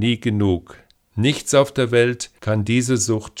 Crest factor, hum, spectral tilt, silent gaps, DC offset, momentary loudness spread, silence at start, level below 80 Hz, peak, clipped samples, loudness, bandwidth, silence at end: 16 dB; none; -5 dB/octave; none; under 0.1%; 7 LU; 0 s; -50 dBFS; -2 dBFS; under 0.1%; -19 LUFS; 15.5 kHz; 0 s